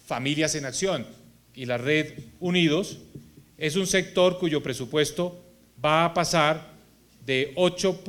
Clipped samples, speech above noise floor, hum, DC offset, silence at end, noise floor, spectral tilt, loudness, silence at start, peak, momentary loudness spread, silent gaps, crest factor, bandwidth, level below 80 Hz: under 0.1%; 30 dB; none; under 0.1%; 0 s; -55 dBFS; -4 dB/octave; -25 LUFS; 0.1 s; -6 dBFS; 11 LU; none; 20 dB; 17.5 kHz; -58 dBFS